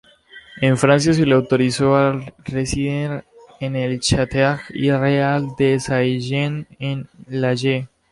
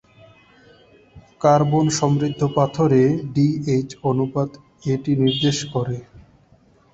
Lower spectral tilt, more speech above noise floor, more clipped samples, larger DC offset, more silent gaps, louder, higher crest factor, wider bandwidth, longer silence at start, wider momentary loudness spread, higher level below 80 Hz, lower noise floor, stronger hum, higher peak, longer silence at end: about the same, -6 dB/octave vs -6.5 dB/octave; second, 27 dB vs 36 dB; neither; neither; neither; about the same, -19 LUFS vs -20 LUFS; about the same, 16 dB vs 18 dB; first, 11.5 kHz vs 8 kHz; second, 0.35 s vs 1.15 s; first, 12 LU vs 9 LU; first, -44 dBFS vs -52 dBFS; second, -45 dBFS vs -55 dBFS; neither; about the same, -2 dBFS vs -2 dBFS; second, 0.25 s vs 0.75 s